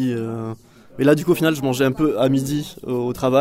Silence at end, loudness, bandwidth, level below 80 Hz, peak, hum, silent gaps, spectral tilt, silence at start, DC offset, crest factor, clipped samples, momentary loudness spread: 0 s; -20 LUFS; 16 kHz; -50 dBFS; -2 dBFS; none; none; -6 dB/octave; 0 s; under 0.1%; 16 dB; under 0.1%; 11 LU